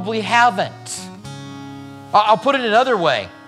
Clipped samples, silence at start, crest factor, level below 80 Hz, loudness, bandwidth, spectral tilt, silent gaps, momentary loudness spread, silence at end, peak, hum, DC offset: under 0.1%; 0 s; 18 dB; -62 dBFS; -16 LUFS; 13.5 kHz; -3.5 dB/octave; none; 19 LU; 0.05 s; 0 dBFS; none; under 0.1%